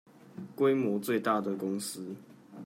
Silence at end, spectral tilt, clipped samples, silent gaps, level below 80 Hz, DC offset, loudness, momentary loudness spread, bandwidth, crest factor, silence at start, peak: 0 s; -5.5 dB/octave; under 0.1%; none; -82 dBFS; under 0.1%; -31 LUFS; 20 LU; 16 kHz; 18 dB; 0.35 s; -14 dBFS